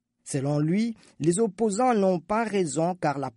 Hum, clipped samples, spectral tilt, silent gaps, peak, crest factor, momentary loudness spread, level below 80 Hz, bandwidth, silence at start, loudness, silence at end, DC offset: none; under 0.1%; -6 dB/octave; none; -10 dBFS; 16 dB; 6 LU; -64 dBFS; 11.5 kHz; 0.25 s; -26 LUFS; 0.05 s; under 0.1%